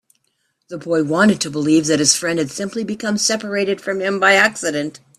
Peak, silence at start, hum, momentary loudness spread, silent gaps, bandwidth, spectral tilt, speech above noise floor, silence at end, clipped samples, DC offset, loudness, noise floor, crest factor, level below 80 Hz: 0 dBFS; 0.7 s; none; 10 LU; none; 14.5 kHz; -3 dB/octave; 51 dB; 0.2 s; under 0.1%; under 0.1%; -17 LUFS; -68 dBFS; 18 dB; -60 dBFS